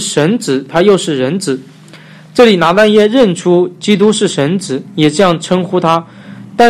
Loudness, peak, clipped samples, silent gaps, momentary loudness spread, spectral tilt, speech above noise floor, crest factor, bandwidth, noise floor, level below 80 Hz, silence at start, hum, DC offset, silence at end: -11 LUFS; 0 dBFS; 0.2%; none; 9 LU; -5 dB/octave; 26 dB; 10 dB; 14 kHz; -36 dBFS; -50 dBFS; 0 s; none; under 0.1%; 0 s